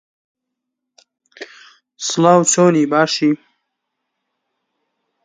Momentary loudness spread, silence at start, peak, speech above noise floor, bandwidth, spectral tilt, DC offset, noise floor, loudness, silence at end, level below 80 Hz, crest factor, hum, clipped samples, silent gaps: 24 LU; 1.4 s; 0 dBFS; 66 dB; 9.6 kHz; -4 dB/octave; under 0.1%; -79 dBFS; -14 LUFS; 1.9 s; -68 dBFS; 20 dB; none; under 0.1%; none